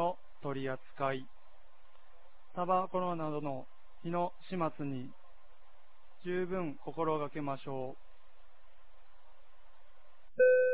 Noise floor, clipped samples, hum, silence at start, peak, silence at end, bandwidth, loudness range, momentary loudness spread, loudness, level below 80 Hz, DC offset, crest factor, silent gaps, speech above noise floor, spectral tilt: -64 dBFS; under 0.1%; none; 0 s; -16 dBFS; 0 s; 4 kHz; 4 LU; 14 LU; -36 LUFS; -68 dBFS; 0.8%; 20 dB; none; 28 dB; -5.5 dB/octave